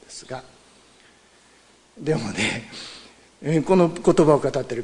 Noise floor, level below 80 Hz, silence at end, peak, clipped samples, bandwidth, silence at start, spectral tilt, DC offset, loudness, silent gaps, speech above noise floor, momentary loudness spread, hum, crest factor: -55 dBFS; -52 dBFS; 0 s; -2 dBFS; under 0.1%; 11 kHz; 0.1 s; -6 dB/octave; under 0.1%; -21 LUFS; none; 34 dB; 19 LU; none; 20 dB